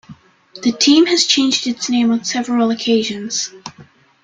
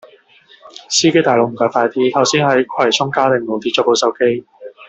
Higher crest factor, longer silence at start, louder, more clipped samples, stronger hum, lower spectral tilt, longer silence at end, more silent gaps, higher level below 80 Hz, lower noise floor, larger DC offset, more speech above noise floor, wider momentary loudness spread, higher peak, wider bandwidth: about the same, 16 dB vs 14 dB; second, 0.1 s vs 0.65 s; about the same, -15 LUFS vs -15 LUFS; neither; neither; about the same, -2.5 dB/octave vs -3.5 dB/octave; first, 0.4 s vs 0.05 s; neither; about the same, -60 dBFS vs -60 dBFS; about the same, -46 dBFS vs -48 dBFS; neither; about the same, 30 dB vs 33 dB; first, 10 LU vs 5 LU; about the same, 0 dBFS vs -2 dBFS; first, 9.4 kHz vs 8.4 kHz